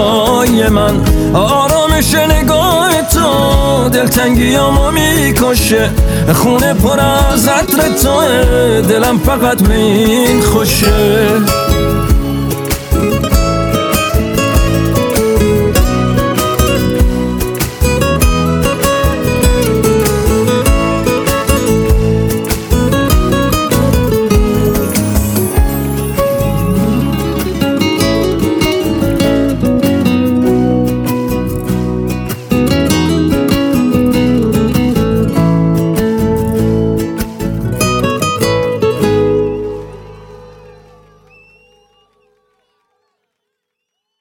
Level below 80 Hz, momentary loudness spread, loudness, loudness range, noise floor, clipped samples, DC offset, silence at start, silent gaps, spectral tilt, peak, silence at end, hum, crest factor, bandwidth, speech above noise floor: -20 dBFS; 5 LU; -11 LUFS; 4 LU; -74 dBFS; under 0.1%; under 0.1%; 0 s; none; -5 dB/octave; 0 dBFS; 3.5 s; none; 12 dB; over 20 kHz; 65 dB